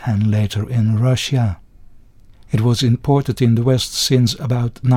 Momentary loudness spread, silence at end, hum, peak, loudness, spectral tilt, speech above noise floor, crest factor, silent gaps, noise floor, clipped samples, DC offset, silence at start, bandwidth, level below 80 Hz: 5 LU; 0 s; none; -2 dBFS; -17 LUFS; -6 dB/octave; 28 dB; 14 dB; none; -43 dBFS; under 0.1%; under 0.1%; 0 s; 15.5 kHz; -42 dBFS